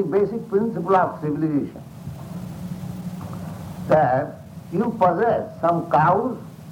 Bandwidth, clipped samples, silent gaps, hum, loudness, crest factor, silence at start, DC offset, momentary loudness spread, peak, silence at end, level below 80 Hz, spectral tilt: 17 kHz; under 0.1%; none; none; -22 LUFS; 18 dB; 0 s; under 0.1%; 16 LU; -4 dBFS; 0 s; -54 dBFS; -8.5 dB/octave